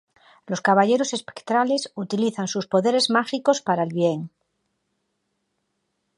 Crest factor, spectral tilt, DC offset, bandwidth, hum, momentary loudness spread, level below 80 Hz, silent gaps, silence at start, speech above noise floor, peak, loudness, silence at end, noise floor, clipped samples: 20 dB; -4.5 dB/octave; under 0.1%; 11.5 kHz; none; 9 LU; -74 dBFS; none; 0.5 s; 53 dB; -4 dBFS; -22 LUFS; 1.9 s; -75 dBFS; under 0.1%